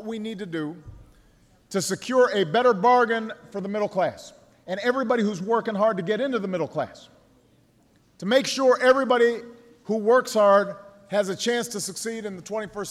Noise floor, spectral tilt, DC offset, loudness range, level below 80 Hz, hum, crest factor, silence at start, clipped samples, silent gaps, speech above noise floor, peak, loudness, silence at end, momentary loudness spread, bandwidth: -60 dBFS; -4 dB/octave; under 0.1%; 5 LU; -64 dBFS; none; 16 dB; 0 s; under 0.1%; none; 37 dB; -8 dBFS; -23 LUFS; 0 s; 15 LU; 15 kHz